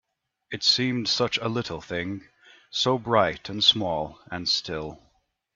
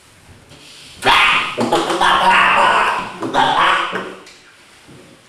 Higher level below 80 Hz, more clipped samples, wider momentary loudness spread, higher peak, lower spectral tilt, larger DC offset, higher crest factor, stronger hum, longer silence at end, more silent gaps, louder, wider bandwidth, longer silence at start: second, -58 dBFS vs -48 dBFS; neither; first, 14 LU vs 11 LU; second, -4 dBFS vs 0 dBFS; about the same, -3.5 dB/octave vs -2.5 dB/octave; neither; first, 22 dB vs 16 dB; neither; second, 0.6 s vs 1 s; neither; second, -24 LUFS vs -13 LUFS; second, 7.8 kHz vs 15 kHz; about the same, 0.5 s vs 0.5 s